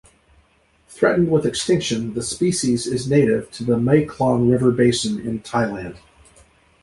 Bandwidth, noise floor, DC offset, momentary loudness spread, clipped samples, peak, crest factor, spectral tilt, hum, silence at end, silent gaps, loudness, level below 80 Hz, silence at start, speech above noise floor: 11.5 kHz; -58 dBFS; under 0.1%; 7 LU; under 0.1%; -2 dBFS; 18 dB; -5.5 dB/octave; none; 0.85 s; none; -19 LUFS; -48 dBFS; 0.9 s; 40 dB